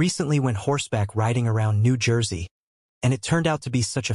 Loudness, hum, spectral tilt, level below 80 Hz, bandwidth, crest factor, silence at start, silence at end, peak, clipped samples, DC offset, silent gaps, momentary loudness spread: -23 LUFS; none; -5.5 dB/octave; -50 dBFS; 11.5 kHz; 14 dB; 0 s; 0 s; -8 dBFS; under 0.1%; under 0.1%; 2.51-3.01 s; 5 LU